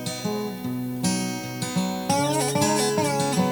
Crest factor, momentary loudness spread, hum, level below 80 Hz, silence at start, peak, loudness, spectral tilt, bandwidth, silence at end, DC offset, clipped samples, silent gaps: 16 dB; 8 LU; none; -60 dBFS; 0 s; -8 dBFS; -24 LUFS; -4.5 dB/octave; over 20 kHz; 0 s; under 0.1%; under 0.1%; none